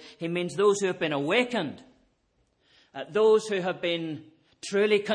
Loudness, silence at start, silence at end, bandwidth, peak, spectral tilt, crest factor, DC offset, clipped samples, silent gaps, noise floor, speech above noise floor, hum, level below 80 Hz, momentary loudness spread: -26 LUFS; 0 s; 0 s; 10 kHz; -10 dBFS; -4.5 dB/octave; 18 dB; under 0.1%; under 0.1%; none; -71 dBFS; 45 dB; none; -74 dBFS; 16 LU